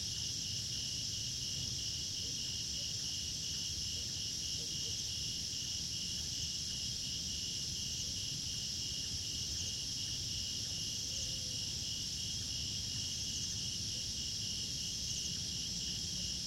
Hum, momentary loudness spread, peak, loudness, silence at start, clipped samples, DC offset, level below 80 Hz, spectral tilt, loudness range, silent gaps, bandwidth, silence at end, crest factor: none; 1 LU; -26 dBFS; -37 LUFS; 0 s; under 0.1%; under 0.1%; -56 dBFS; -1 dB/octave; 0 LU; none; 16.5 kHz; 0 s; 14 dB